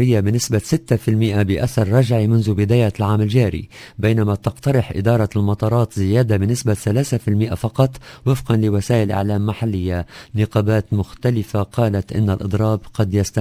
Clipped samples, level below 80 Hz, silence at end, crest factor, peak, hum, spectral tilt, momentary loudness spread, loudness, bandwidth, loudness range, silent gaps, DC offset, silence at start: under 0.1%; -36 dBFS; 0 s; 16 dB; 0 dBFS; none; -7 dB/octave; 5 LU; -18 LUFS; 16 kHz; 3 LU; none; under 0.1%; 0 s